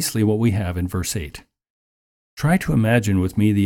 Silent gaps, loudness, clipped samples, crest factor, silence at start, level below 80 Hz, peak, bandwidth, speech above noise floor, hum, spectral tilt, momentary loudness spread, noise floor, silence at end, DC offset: 1.70-2.37 s; -20 LUFS; under 0.1%; 14 dB; 0 s; -40 dBFS; -6 dBFS; 17.5 kHz; over 71 dB; none; -6 dB/octave; 8 LU; under -90 dBFS; 0 s; under 0.1%